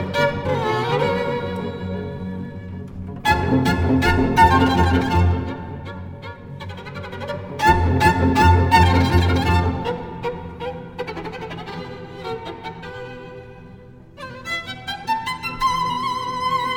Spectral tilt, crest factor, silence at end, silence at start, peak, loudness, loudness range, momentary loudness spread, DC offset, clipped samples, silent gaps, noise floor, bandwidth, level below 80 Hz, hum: -6.5 dB/octave; 20 dB; 0 s; 0 s; -2 dBFS; -20 LUFS; 14 LU; 19 LU; under 0.1%; under 0.1%; none; -42 dBFS; 17.5 kHz; -32 dBFS; none